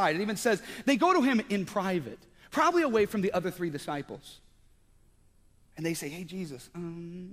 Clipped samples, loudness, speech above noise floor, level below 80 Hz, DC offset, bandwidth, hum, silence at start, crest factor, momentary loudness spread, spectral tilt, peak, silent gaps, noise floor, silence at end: under 0.1%; -29 LUFS; 32 dB; -62 dBFS; under 0.1%; 15.5 kHz; none; 0 s; 18 dB; 16 LU; -5 dB/octave; -12 dBFS; none; -62 dBFS; 0 s